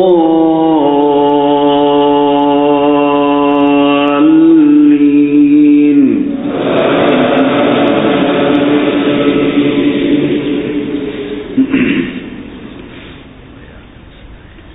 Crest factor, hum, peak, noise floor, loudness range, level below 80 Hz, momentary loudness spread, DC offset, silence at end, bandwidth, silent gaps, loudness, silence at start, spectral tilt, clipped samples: 10 dB; none; 0 dBFS; -34 dBFS; 9 LU; -42 dBFS; 11 LU; under 0.1%; 0 s; 4 kHz; none; -10 LUFS; 0 s; -10 dB/octave; under 0.1%